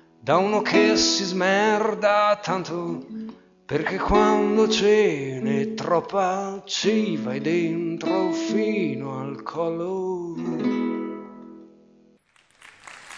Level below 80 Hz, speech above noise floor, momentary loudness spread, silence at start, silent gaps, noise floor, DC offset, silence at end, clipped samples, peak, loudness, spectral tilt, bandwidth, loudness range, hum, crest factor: -50 dBFS; 38 dB; 13 LU; 0.25 s; none; -60 dBFS; under 0.1%; 0 s; under 0.1%; -4 dBFS; -23 LUFS; -4.5 dB/octave; 8.6 kHz; 8 LU; none; 18 dB